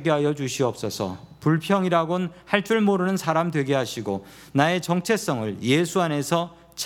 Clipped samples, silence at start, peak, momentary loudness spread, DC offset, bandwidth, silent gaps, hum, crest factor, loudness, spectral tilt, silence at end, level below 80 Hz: under 0.1%; 0 s; 0 dBFS; 8 LU; under 0.1%; 17.5 kHz; none; none; 22 dB; -24 LUFS; -5.5 dB/octave; 0 s; -62 dBFS